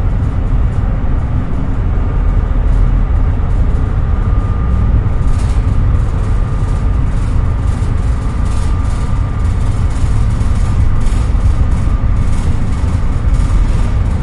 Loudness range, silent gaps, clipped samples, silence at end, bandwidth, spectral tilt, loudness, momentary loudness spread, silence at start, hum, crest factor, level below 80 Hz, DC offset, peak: 1 LU; none; under 0.1%; 0 s; 11 kHz; -8 dB/octave; -16 LUFS; 3 LU; 0 s; none; 10 dB; -14 dBFS; under 0.1%; -2 dBFS